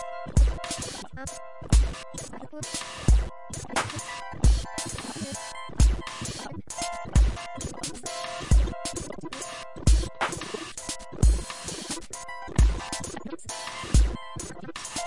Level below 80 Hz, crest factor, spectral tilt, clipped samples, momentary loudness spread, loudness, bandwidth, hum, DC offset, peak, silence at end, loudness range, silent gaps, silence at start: -28 dBFS; 18 dB; -4.5 dB/octave; under 0.1%; 12 LU; -29 LUFS; 11.5 kHz; none; 0.2%; -8 dBFS; 0 s; 2 LU; none; 0 s